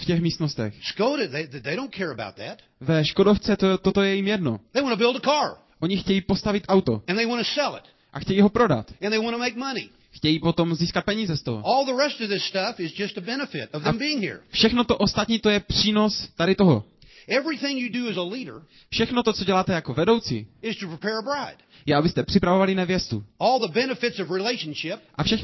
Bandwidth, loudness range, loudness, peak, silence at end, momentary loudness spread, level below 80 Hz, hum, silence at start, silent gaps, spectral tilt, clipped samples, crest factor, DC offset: 6.2 kHz; 3 LU; -23 LUFS; -6 dBFS; 0 s; 11 LU; -48 dBFS; none; 0 s; none; -5.5 dB/octave; under 0.1%; 18 dB; under 0.1%